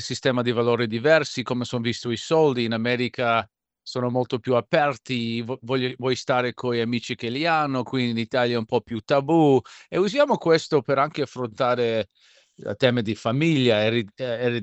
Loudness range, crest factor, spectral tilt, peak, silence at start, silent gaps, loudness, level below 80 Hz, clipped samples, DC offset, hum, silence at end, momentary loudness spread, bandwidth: 3 LU; 20 dB; -6 dB/octave; -4 dBFS; 0 s; none; -23 LUFS; -66 dBFS; under 0.1%; under 0.1%; none; 0 s; 9 LU; 8.4 kHz